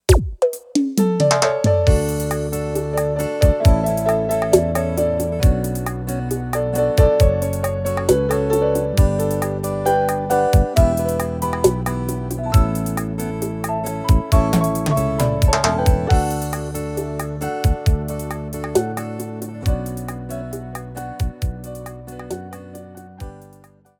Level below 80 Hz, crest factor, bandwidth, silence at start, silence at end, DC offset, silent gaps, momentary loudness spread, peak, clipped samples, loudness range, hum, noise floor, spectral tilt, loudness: -26 dBFS; 18 dB; 19 kHz; 0.1 s; 0.55 s; under 0.1%; none; 13 LU; 0 dBFS; under 0.1%; 9 LU; none; -49 dBFS; -6 dB/octave; -20 LUFS